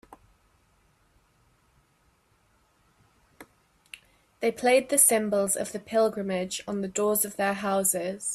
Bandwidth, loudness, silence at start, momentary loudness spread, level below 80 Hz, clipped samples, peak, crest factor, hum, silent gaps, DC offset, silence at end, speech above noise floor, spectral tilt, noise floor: 15.5 kHz; -25 LUFS; 3.4 s; 12 LU; -68 dBFS; under 0.1%; -6 dBFS; 22 dB; none; none; under 0.1%; 0 s; 41 dB; -3 dB/octave; -67 dBFS